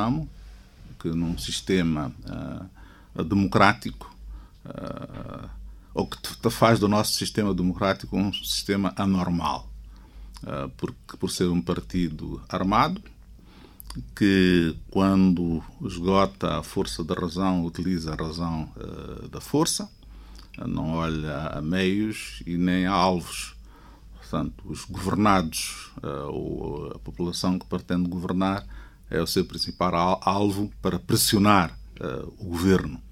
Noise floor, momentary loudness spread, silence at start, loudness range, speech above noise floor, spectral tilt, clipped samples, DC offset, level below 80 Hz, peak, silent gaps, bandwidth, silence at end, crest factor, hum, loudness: -48 dBFS; 17 LU; 0 s; 6 LU; 23 dB; -5 dB/octave; under 0.1%; under 0.1%; -44 dBFS; -2 dBFS; none; 16 kHz; 0 s; 24 dB; none; -25 LUFS